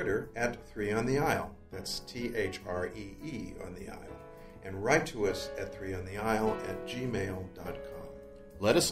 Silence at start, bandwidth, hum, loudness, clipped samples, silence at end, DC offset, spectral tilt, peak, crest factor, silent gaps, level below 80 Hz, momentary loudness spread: 0 s; 16 kHz; none; -34 LUFS; under 0.1%; 0 s; under 0.1%; -4.5 dB/octave; -12 dBFS; 22 dB; none; -52 dBFS; 17 LU